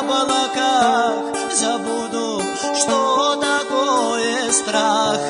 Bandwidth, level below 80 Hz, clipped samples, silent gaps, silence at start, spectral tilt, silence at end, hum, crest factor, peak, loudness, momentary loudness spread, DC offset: 11 kHz; -62 dBFS; under 0.1%; none; 0 s; -1.5 dB/octave; 0 s; none; 16 dB; -2 dBFS; -18 LUFS; 6 LU; under 0.1%